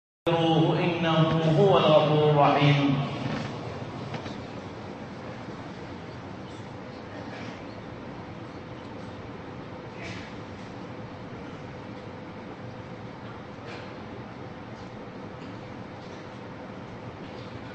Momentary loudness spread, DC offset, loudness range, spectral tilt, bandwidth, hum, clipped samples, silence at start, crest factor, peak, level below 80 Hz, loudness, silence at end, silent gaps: 20 LU; under 0.1%; 18 LU; -7.5 dB/octave; 8.2 kHz; none; under 0.1%; 0.25 s; 22 dB; -8 dBFS; -58 dBFS; -26 LUFS; 0 s; none